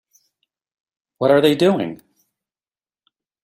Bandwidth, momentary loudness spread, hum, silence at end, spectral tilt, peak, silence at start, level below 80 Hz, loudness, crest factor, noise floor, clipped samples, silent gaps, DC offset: 16 kHz; 10 LU; none; 1.5 s; -6 dB/octave; -2 dBFS; 1.2 s; -64 dBFS; -17 LUFS; 20 dB; under -90 dBFS; under 0.1%; none; under 0.1%